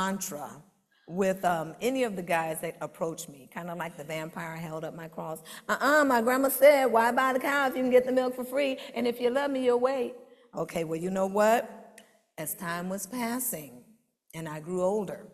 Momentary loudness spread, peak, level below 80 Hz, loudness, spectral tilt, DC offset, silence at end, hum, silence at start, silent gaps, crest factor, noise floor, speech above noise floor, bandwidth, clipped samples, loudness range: 16 LU; -8 dBFS; -70 dBFS; -28 LUFS; -4.5 dB/octave; under 0.1%; 0.05 s; none; 0 s; none; 20 dB; -62 dBFS; 34 dB; 14.5 kHz; under 0.1%; 10 LU